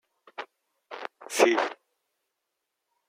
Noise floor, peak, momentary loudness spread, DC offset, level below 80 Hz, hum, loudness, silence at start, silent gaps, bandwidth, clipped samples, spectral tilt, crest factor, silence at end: -83 dBFS; -6 dBFS; 22 LU; under 0.1%; -90 dBFS; none; -25 LUFS; 0.4 s; none; 16 kHz; under 0.1%; -1.5 dB/octave; 26 dB; 1.35 s